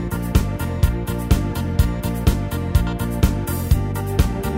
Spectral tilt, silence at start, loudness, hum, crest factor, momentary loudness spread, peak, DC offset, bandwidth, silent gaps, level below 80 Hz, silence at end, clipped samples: -6.5 dB/octave; 0 s; -21 LUFS; none; 18 dB; 3 LU; -2 dBFS; under 0.1%; 16.5 kHz; none; -22 dBFS; 0 s; under 0.1%